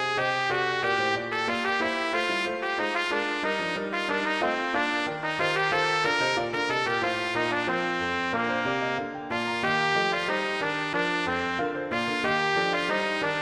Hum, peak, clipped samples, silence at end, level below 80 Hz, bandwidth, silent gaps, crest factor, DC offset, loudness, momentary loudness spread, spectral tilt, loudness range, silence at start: none; -10 dBFS; under 0.1%; 0 s; -62 dBFS; 14 kHz; none; 16 dB; under 0.1%; -26 LUFS; 4 LU; -4 dB/octave; 1 LU; 0 s